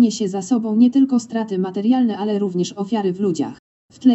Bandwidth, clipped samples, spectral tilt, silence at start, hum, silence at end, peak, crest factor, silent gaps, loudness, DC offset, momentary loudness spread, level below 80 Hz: 8.2 kHz; under 0.1%; -6.5 dB/octave; 0 s; none; 0 s; -4 dBFS; 14 dB; 3.59-3.89 s; -19 LUFS; under 0.1%; 8 LU; -68 dBFS